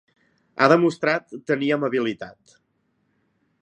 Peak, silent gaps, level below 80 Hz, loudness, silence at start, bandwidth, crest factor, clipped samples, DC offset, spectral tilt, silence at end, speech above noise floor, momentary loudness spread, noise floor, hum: 0 dBFS; none; -72 dBFS; -21 LUFS; 0.55 s; 9.6 kHz; 24 dB; under 0.1%; under 0.1%; -6.5 dB/octave; 1.3 s; 48 dB; 19 LU; -70 dBFS; none